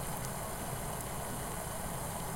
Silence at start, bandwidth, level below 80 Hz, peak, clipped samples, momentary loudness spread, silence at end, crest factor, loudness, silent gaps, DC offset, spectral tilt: 0 s; 16.5 kHz; -50 dBFS; -22 dBFS; under 0.1%; 0 LU; 0 s; 18 dB; -39 LUFS; none; under 0.1%; -4 dB/octave